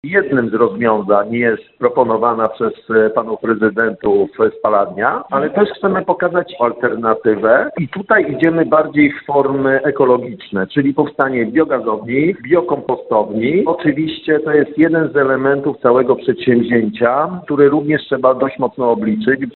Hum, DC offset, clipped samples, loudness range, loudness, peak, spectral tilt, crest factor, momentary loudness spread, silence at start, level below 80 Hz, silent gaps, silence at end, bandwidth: none; under 0.1%; under 0.1%; 2 LU; -15 LUFS; 0 dBFS; -10 dB/octave; 14 dB; 5 LU; 0.05 s; -54 dBFS; none; 0.1 s; 4.3 kHz